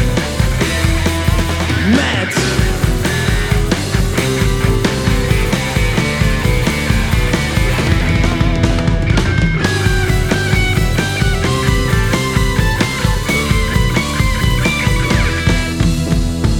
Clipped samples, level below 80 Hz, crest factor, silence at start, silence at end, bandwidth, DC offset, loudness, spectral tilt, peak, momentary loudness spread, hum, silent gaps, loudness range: under 0.1%; -20 dBFS; 14 dB; 0 s; 0 s; 18.5 kHz; under 0.1%; -15 LUFS; -5 dB/octave; 0 dBFS; 2 LU; none; none; 1 LU